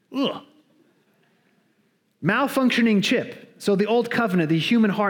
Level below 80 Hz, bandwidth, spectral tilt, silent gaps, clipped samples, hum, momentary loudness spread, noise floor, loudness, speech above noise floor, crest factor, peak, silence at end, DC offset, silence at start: -72 dBFS; 18.5 kHz; -5.5 dB/octave; none; under 0.1%; none; 9 LU; -66 dBFS; -21 LUFS; 46 dB; 18 dB; -4 dBFS; 0 s; under 0.1%; 0.1 s